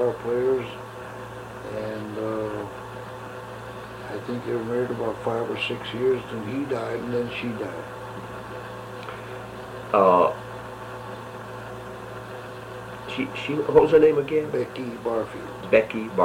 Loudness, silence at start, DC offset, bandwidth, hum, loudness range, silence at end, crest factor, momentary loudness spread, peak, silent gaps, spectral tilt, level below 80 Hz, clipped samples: -25 LUFS; 0 s; under 0.1%; 16 kHz; none; 10 LU; 0 s; 24 dB; 17 LU; -2 dBFS; none; -6.5 dB/octave; -54 dBFS; under 0.1%